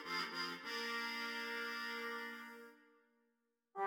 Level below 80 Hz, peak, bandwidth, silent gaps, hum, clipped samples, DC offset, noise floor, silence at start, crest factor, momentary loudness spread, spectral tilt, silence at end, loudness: under -90 dBFS; -30 dBFS; 19 kHz; none; none; under 0.1%; under 0.1%; -85 dBFS; 0 s; 16 dB; 14 LU; -2 dB/octave; 0 s; -43 LUFS